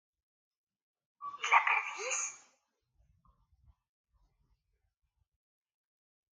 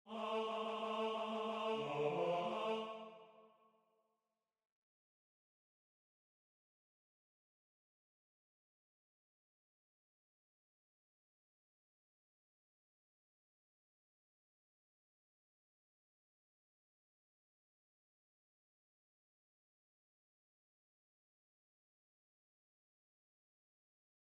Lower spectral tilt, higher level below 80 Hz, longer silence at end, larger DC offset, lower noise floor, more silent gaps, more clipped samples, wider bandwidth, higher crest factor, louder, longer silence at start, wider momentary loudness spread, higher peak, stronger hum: second, 2 dB/octave vs -5.5 dB/octave; first, -78 dBFS vs under -90 dBFS; second, 3.95 s vs 20.9 s; neither; second, -78 dBFS vs under -90 dBFS; neither; neither; about the same, 10 kHz vs 10.5 kHz; about the same, 28 dB vs 24 dB; first, -31 LUFS vs -41 LUFS; first, 1.2 s vs 0.05 s; first, 18 LU vs 10 LU; first, -12 dBFS vs -26 dBFS; neither